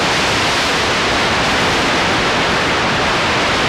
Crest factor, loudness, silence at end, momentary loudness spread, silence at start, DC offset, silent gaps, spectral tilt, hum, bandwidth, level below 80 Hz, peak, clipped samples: 10 dB; -14 LUFS; 0 s; 1 LU; 0 s; under 0.1%; none; -3 dB/octave; none; 16 kHz; -34 dBFS; -6 dBFS; under 0.1%